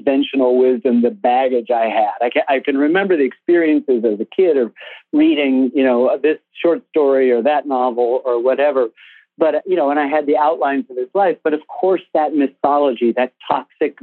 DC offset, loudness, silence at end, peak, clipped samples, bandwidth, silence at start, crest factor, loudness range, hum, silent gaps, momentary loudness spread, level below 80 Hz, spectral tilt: under 0.1%; -16 LUFS; 0.1 s; 0 dBFS; under 0.1%; 4.3 kHz; 0.05 s; 14 dB; 2 LU; none; none; 5 LU; -72 dBFS; -8.5 dB/octave